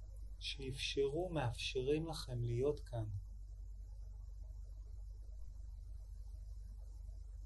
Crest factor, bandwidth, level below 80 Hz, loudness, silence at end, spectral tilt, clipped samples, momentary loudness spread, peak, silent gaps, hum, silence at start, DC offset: 18 dB; 12 kHz; -50 dBFS; -43 LUFS; 0 s; -5.5 dB/octave; under 0.1%; 16 LU; -26 dBFS; none; none; 0 s; under 0.1%